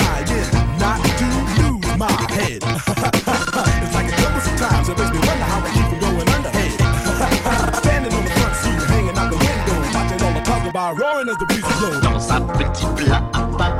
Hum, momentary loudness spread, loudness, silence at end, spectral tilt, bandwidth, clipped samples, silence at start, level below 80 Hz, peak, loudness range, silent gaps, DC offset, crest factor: none; 3 LU; -18 LUFS; 0 s; -5 dB/octave; 16.5 kHz; under 0.1%; 0 s; -24 dBFS; -2 dBFS; 1 LU; none; under 0.1%; 16 dB